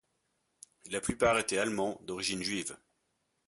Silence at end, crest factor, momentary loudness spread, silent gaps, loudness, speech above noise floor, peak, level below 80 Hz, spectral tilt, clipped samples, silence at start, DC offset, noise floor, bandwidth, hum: 0.7 s; 20 dB; 13 LU; none; -32 LUFS; 47 dB; -14 dBFS; -60 dBFS; -3 dB/octave; under 0.1%; 0.85 s; under 0.1%; -79 dBFS; 12 kHz; none